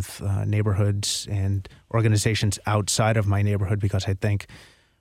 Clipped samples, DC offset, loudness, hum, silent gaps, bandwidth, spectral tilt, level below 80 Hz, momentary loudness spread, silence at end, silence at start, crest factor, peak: under 0.1%; under 0.1%; -24 LUFS; none; none; 14 kHz; -5 dB/octave; -48 dBFS; 7 LU; 0.4 s; 0 s; 16 dB; -8 dBFS